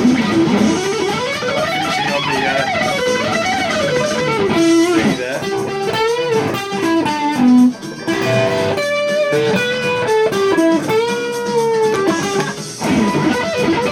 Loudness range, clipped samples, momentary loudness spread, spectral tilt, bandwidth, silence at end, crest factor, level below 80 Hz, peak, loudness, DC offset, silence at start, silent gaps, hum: 1 LU; under 0.1%; 6 LU; -4.5 dB/octave; 16.5 kHz; 0 s; 14 dB; -48 dBFS; -2 dBFS; -16 LUFS; under 0.1%; 0 s; none; none